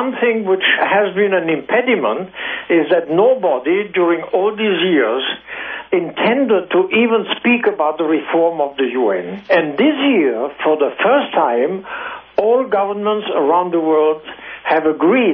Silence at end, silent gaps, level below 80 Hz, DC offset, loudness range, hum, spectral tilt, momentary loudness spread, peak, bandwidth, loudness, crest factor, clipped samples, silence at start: 0 s; none; -62 dBFS; under 0.1%; 1 LU; none; -8.5 dB/octave; 7 LU; -2 dBFS; 5.4 kHz; -16 LUFS; 14 dB; under 0.1%; 0 s